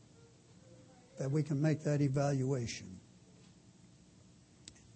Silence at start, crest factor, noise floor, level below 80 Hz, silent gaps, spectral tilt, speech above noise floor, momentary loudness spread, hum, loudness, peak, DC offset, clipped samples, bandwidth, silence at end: 0.7 s; 18 dB; -62 dBFS; -70 dBFS; none; -7 dB/octave; 28 dB; 24 LU; none; -35 LUFS; -20 dBFS; under 0.1%; under 0.1%; 8.4 kHz; 0.25 s